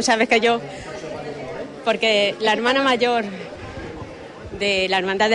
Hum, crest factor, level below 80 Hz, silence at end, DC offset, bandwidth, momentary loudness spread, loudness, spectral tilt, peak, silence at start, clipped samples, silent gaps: none; 16 dB; -50 dBFS; 0 s; under 0.1%; 11 kHz; 17 LU; -19 LUFS; -3 dB/octave; -4 dBFS; 0 s; under 0.1%; none